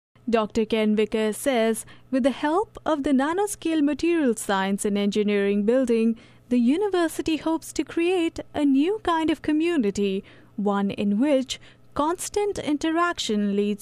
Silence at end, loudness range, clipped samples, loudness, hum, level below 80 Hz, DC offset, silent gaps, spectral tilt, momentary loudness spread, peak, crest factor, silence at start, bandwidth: 0.05 s; 2 LU; under 0.1%; -24 LUFS; none; -54 dBFS; under 0.1%; none; -5 dB/octave; 5 LU; -8 dBFS; 16 dB; 0.25 s; 15.5 kHz